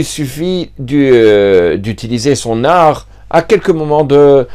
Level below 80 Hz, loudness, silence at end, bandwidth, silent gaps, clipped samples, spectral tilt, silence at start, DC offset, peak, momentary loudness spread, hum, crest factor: -38 dBFS; -10 LUFS; 0 s; 15 kHz; none; 0.6%; -6 dB/octave; 0 s; under 0.1%; 0 dBFS; 11 LU; none; 10 dB